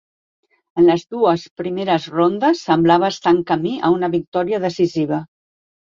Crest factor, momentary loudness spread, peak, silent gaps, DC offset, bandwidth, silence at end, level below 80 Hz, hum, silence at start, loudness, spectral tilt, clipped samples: 16 dB; 8 LU; -2 dBFS; 1.51-1.56 s, 4.28-4.32 s; under 0.1%; 7.4 kHz; 0.6 s; -58 dBFS; none; 0.75 s; -18 LUFS; -6.5 dB/octave; under 0.1%